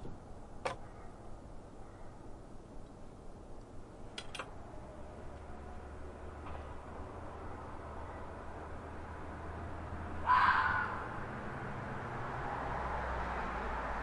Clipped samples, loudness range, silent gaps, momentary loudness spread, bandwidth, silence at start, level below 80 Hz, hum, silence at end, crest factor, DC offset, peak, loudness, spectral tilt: under 0.1%; 15 LU; none; 18 LU; 11.5 kHz; 0 s; -50 dBFS; none; 0 s; 24 dB; under 0.1%; -16 dBFS; -39 LUFS; -5.5 dB/octave